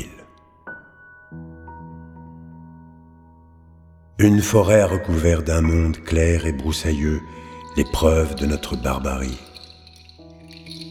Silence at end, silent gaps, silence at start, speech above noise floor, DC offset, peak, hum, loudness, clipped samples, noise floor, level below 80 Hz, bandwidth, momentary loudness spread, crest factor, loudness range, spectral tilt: 0 s; none; 0 s; 30 dB; under 0.1%; -2 dBFS; none; -20 LUFS; under 0.1%; -49 dBFS; -30 dBFS; 16 kHz; 25 LU; 20 dB; 22 LU; -6 dB/octave